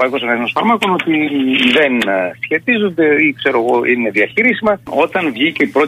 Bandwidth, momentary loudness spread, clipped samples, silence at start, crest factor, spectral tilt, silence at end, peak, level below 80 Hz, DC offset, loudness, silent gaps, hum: 15.5 kHz; 5 LU; under 0.1%; 0 s; 12 dB; -5.5 dB/octave; 0 s; -2 dBFS; -56 dBFS; under 0.1%; -14 LUFS; none; none